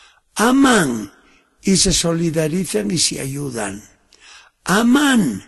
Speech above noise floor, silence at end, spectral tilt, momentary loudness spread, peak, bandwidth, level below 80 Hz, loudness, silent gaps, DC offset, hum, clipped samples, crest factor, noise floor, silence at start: 31 dB; 0.05 s; -3.5 dB/octave; 14 LU; -2 dBFS; 12.5 kHz; -40 dBFS; -17 LUFS; none; under 0.1%; none; under 0.1%; 16 dB; -48 dBFS; 0.35 s